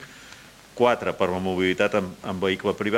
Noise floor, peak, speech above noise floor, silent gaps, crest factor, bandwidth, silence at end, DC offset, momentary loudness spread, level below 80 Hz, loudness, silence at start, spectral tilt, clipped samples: -47 dBFS; -6 dBFS; 24 dB; none; 18 dB; 16 kHz; 0 s; under 0.1%; 21 LU; -58 dBFS; -24 LUFS; 0 s; -5.5 dB/octave; under 0.1%